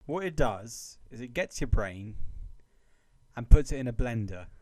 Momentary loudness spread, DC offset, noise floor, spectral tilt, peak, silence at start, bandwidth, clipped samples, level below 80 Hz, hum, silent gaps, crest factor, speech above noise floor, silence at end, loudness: 21 LU; under 0.1%; -63 dBFS; -6 dB/octave; -4 dBFS; 0.1 s; 12 kHz; under 0.1%; -30 dBFS; none; none; 24 dB; 36 dB; 0.05 s; -31 LUFS